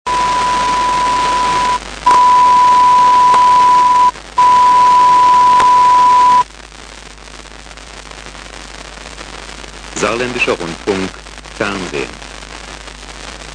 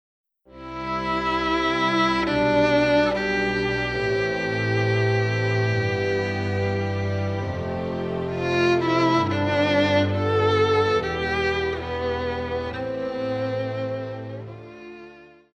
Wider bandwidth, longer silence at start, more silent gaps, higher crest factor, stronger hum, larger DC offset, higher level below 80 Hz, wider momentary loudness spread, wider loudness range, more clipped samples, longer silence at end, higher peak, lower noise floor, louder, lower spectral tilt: first, 10 kHz vs 8.6 kHz; second, 0.05 s vs 0.55 s; neither; about the same, 12 dB vs 14 dB; neither; neither; first, -38 dBFS vs -46 dBFS; first, 22 LU vs 10 LU; first, 14 LU vs 6 LU; neither; second, 0 s vs 0.3 s; first, -2 dBFS vs -8 dBFS; second, -34 dBFS vs -47 dBFS; first, -10 LUFS vs -23 LUFS; second, -2.5 dB/octave vs -6.5 dB/octave